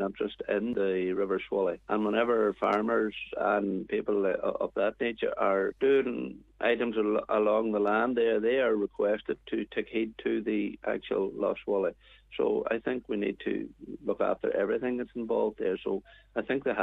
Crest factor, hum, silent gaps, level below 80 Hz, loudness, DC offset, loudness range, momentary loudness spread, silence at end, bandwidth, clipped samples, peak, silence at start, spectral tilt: 16 dB; none; none; -62 dBFS; -30 LUFS; under 0.1%; 4 LU; 8 LU; 0 s; 5 kHz; under 0.1%; -12 dBFS; 0 s; -7.5 dB/octave